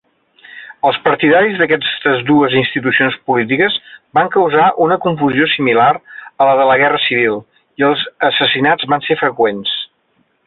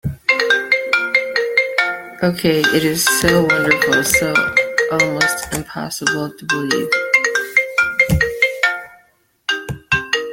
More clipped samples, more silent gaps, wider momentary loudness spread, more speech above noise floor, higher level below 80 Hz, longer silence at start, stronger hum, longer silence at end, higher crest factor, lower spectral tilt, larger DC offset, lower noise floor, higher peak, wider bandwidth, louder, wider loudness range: neither; neither; about the same, 8 LU vs 8 LU; first, 47 dB vs 40 dB; second, -56 dBFS vs -40 dBFS; first, 0.55 s vs 0.05 s; neither; first, 0.6 s vs 0 s; second, 12 dB vs 18 dB; first, -9 dB/octave vs -3.5 dB/octave; neither; first, -60 dBFS vs -56 dBFS; about the same, -2 dBFS vs 0 dBFS; second, 4.4 kHz vs 17 kHz; first, -13 LUFS vs -16 LUFS; about the same, 1 LU vs 2 LU